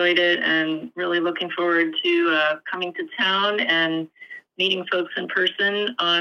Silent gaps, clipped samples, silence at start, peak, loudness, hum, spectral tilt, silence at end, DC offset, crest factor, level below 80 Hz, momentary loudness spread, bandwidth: none; under 0.1%; 0 s; -6 dBFS; -21 LUFS; none; -4.5 dB/octave; 0 s; under 0.1%; 16 dB; -82 dBFS; 9 LU; 6.8 kHz